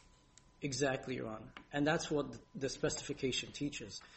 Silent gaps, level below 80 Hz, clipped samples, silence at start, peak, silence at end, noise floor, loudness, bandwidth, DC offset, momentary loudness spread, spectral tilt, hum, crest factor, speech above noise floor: none; -62 dBFS; under 0.1%; 0.6 s; -20 dBFS; 0 s; -65 dBFS; -39 LUFS; 8.4 kHz; under 0.1%; 11 LU; -4 dB/octave; none; 20 dB; 26 dB